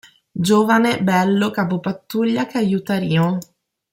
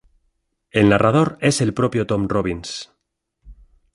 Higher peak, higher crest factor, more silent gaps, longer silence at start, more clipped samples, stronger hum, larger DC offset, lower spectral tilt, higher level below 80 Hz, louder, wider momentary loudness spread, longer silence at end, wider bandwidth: about the same, -4 dBFS vs -2 dBFS; about the same, 16 dB vs 18 dB; neither; second, 0.35 s vs 0.75 s; neither; neither; neither; about the same, -6 dB/octave vs -5.5 dB/octave; second, -60 dBFS vs -46 dBFS; about the same, -18 LUFS vs -19 LUFS; second, 9 LU vs 13 LU; about the same, 0.5 s vs 0.4 s; first, 16.5 kHz vs 11.5 kHz